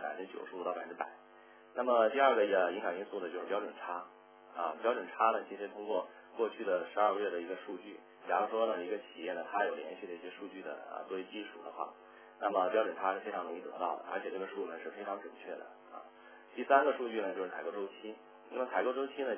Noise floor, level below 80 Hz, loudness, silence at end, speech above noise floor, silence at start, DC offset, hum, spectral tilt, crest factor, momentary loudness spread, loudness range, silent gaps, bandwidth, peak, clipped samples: -57 dBFS; under -90 dBFS; -36 LUFS; 0 s; 21 dB; 0 s; under 0.1%; none; -1.5 dB/octave; 24 dB; 17 LU; 7 LU; none; 3.5 kHz; -12 dBFS; under 0.1%